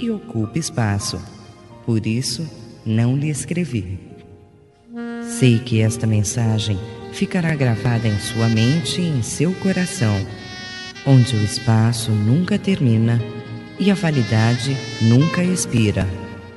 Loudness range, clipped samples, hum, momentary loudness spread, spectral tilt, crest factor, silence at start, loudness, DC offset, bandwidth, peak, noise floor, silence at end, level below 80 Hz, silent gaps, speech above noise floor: 5 LU; under 0.1%; none; 14 LU; -5.5 dB/octave; 18 dB; 0 s; -19 LUFS; under 0.1%; 11.5 kHz; -2 dBFS; -48 dBFS; 0 s; -50 dBFS; none; 30 dB